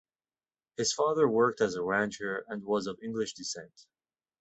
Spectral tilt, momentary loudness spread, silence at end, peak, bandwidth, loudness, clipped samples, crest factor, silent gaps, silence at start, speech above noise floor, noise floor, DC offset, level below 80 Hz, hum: -3.5 dB/octave; 12 LU; 0.6 s; -14 dBFS; 8.4 kHz; -30 LUFS; under 0.1%; 18 dB; none; 0.8 s; over 60 dB; under -90 dBFS; under 0.1%; -70 dBFS; none